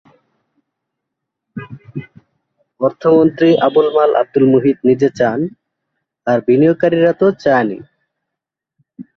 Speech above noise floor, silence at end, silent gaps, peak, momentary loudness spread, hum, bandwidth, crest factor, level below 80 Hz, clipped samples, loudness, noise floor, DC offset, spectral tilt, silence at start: 69 dB; 0.15 s; none; 0 dBFS; 19 LU; none; 6.4 kHz; 16 dB; -58 dBFS; under 0.1%; -13 LUFS; -82 dBFS; under 0.1%; -8 dB/octave; 1.55 s